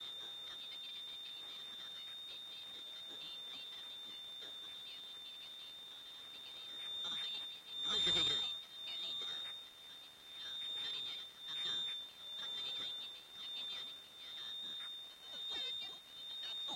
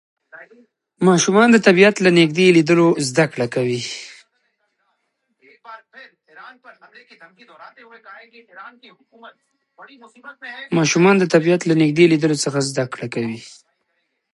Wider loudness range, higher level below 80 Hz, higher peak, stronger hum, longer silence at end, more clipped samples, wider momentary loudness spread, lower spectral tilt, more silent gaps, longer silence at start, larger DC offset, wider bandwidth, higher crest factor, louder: second, 9 LU vs 14 LU; second, -78 dBFS vs -66 dBFS; second, -24 dBFS vs 0 dBFS; neither; second, 0 s vs 0.9 s; neither; second, 11 LU vs 16 LU; second, -1 dB/octave vs -5 dB/octave; neither; second, 0 s vs 0.35 s; neither; first, 16 kHz vs 11.5 kHz; about the same, 20 dB vs 18 dB; second, -42 LUFS vs -16 LUFS